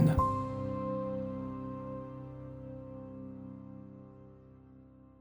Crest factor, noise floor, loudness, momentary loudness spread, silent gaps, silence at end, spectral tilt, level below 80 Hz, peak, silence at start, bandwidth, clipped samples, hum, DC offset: 22 dB; -56 dBFS; -38 LUFS; 23 LU; none; 0.1 s; -9.5 dB/octave; -50 dBFS; -14 dBFS; 0 s; 15.5 kHz; under 0.1%; none; under 0.1%